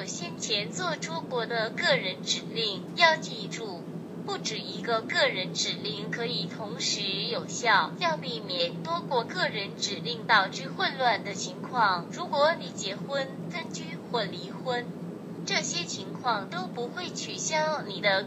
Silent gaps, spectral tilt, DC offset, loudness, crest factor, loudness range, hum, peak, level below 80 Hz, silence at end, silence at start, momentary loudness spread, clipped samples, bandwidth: none; -3 dB/octave; under 0.1%; -29 LUFS; 22 dB; 5 LU; none; -6 dBFS; -76 dBFS; 0 s; 0 s; 11 LU; under 0.1%; 15 kHz